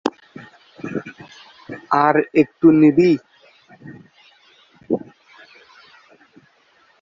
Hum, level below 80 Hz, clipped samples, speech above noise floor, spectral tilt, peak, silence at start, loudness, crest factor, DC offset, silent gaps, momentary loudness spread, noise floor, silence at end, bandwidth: none; -62 dBFS; under 0.1%; 43 dB; -8 dB/octave; -2 dBFS; 0.05 s; -17 LUFS; 20 dB; under 0.1%; none; 24 LU; -57 dBFS; 2.05 s; 7.2 kHz